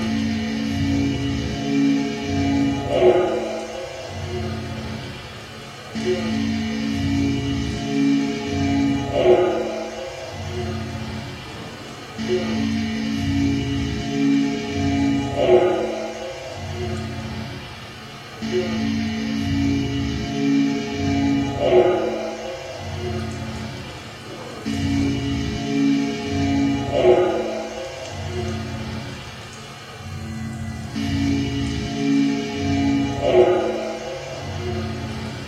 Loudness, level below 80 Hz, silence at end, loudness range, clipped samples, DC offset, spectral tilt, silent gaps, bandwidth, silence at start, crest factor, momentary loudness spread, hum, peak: -22 LUFS; -40 dBFS; 0 s; 7 LU; under 0.1%; under 0.1%; -6 dB/octave; none; 12.5 kHz; 0 s; 20 dB; 15 LU; none; -2 dBFS